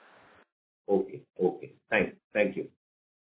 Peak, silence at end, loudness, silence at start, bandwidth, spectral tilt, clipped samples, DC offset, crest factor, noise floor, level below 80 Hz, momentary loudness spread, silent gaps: -10 dBFS; 0.55 s; -30 LUFS; 0.9 s; 4 kHz; -9.5 dB/octave; under 0.1%; under 0.1%; 22 dB; -59 dBFS; -66 dBFS; 16 LU; 2.24-2.31 s